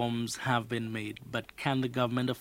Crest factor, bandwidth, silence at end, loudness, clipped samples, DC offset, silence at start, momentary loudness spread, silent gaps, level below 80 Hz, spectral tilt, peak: 18 dB; 16 kHz; 0 s; -33 LUFS; under 0.1%; under 0.1%; 0 s; 8 LU; none; -64 dBFS; -5.5 dB/octave; -14 dBFS